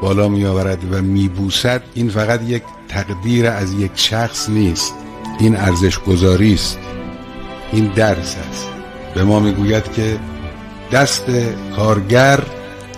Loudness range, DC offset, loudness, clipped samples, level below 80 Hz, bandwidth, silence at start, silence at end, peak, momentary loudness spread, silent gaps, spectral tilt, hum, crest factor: 2 LU; under 0.1%; -16 LUFS; under 0.1%; -34 dBFS; 15.5 kHz; 0 s; 0 s; 0 dBFS; 16 LU; none; -5 dB/octave; none; 16 dB